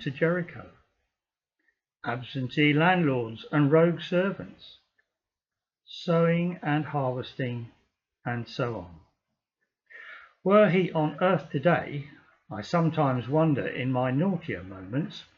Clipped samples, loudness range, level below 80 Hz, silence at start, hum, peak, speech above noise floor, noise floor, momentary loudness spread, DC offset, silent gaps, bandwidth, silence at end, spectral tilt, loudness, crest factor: under 0.1%; 6 LU; -68 dBFS; 0 s; none; -10 dBFS; over 64 dB; under -90 dBFS; 18 LU; under 0.1%; none; 7 kHz; 0.15 s; -8 dB/octave; -26 LUFS; 18 dB